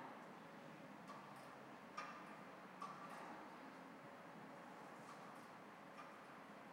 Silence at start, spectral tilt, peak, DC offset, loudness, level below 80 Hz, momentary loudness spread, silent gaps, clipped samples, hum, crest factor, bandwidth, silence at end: 0 s; -4.5 dB/octave; -38 dBFS; under 0.1%; -57 LUFS; under -90 dBFS; 5 LU; none; under 0.1%; none; 18 dB; 16.5 kHz; 0 s